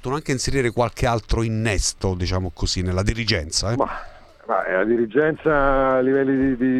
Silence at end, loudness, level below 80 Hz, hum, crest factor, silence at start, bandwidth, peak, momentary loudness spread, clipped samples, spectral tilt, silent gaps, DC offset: 0 s; -21 LUFS; -32 dBFS; none; 16 dB; 0.05 s; 13.5 kHz; -4 dBFS; 6 LU; under 0.1%; -5 dB/octave; none; under 0.1%